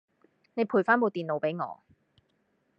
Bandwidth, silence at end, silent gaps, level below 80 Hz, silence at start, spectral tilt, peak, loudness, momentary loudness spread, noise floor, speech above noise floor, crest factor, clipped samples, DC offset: 5.8 kHz; 1.05 s; none; -84 dBFS; 0.55 s; -8.5 dB/octave; -8 dBFS; -28 LUFS; 15 LU; -73 dBFS; 45 dB; 22 dB; under 0.1%; under 0.1%